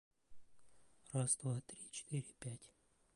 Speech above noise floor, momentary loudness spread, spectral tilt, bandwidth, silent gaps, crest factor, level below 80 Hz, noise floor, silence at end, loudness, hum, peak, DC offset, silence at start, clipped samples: 25 dB; 13 LU; -4.5 dB/octave; 11.5 kHz; none; 24 dB; -76 dBFS; -68 dBFS; 0.5 s; -43 LUFS; none; -22 dBFS; under 0.1%; 0.3 s; under 0.1%